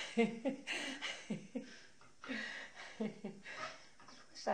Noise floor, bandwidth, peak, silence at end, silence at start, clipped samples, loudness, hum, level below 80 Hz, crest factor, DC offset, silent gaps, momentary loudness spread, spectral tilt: -62 dBFS; 10 kHz; -20 dBFS; 0 s; 0 s; under 0.1%; -43 LUFS; none; -80 dBFS; 24 dB; under 0.1%; none; 19 LU; -4 dB/octave